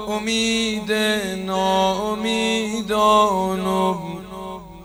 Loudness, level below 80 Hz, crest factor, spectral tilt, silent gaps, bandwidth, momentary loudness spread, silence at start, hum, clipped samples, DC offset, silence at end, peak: -20 LUFS; -48 dBFS; 16 dB; -4 dB/octave; none; over 20 kHz; 14 LU; 0 s; none; under 0.1%; under 0.1%; 0 s; -4 dBFS